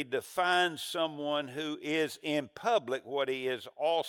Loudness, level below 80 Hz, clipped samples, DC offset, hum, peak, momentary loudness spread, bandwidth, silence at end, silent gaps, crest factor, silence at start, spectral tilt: -32 LUFS; -78 dBFS; under 0.1%; under 0.1%; none; -16 dBFS; 6 LU; 17.5 kHz; 0 s; none; 16 dB; 0 s; -3.5 dB/octave